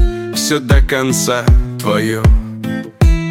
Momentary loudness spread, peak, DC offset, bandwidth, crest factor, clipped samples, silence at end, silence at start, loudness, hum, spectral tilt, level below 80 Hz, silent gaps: 6 LU; 0 dBFS; under 0.1%; 16.5 kHz; 12 dB; under 0.1%; 0 s; 0 s; -14 LUFS; none; -5 dB/octave; -16 dBFS; none